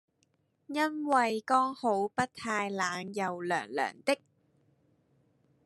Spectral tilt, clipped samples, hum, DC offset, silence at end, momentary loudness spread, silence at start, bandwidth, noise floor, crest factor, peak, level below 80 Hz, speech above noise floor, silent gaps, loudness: -4 dB/octave; under 0.1%; none; under 0.1%; 1.5 s; 7 LU; 0.7 s; 13 kHz; -74 dBFS; 20 dB; -12 dBFS; -78 dBFS; 43 dB; none; -31 LUFS